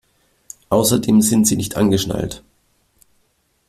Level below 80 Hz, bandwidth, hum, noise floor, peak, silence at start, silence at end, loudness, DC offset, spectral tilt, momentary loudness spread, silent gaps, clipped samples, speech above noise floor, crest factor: -46 dBFS; 16 kHz; none; -64 dBFS; -2 dBFS; 0.7 s; 1.3 s; -17 LUFS; under 0.1%; -5 dB/octave; 11 LU; none; under 0.1%; 48 dB; 16 dB